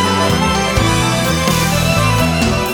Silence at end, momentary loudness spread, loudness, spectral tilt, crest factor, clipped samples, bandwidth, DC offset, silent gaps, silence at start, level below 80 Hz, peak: 0 s; 1 LU; -14 LUFS; -4.5 dB/octave; 12 dB; under 0.1%; 20 kHz; under 0.1%; none; 0 s; -26 dBFS; 0 dBFS